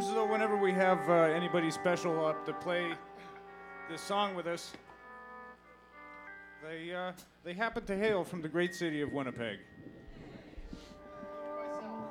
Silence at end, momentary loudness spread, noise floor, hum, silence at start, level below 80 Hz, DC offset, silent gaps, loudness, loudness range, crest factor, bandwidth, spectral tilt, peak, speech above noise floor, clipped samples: 0 s; 22 LU; -57 dBFS; 60 Hz at -65 dBFS; 0 s; -62 dBFS; under 0.1%; none; -34 LUFS; 10 LU; 20 dB; 16.5 kHz; -5.5 dB/octave; -14 dBFS; 24 dB; under 0.1%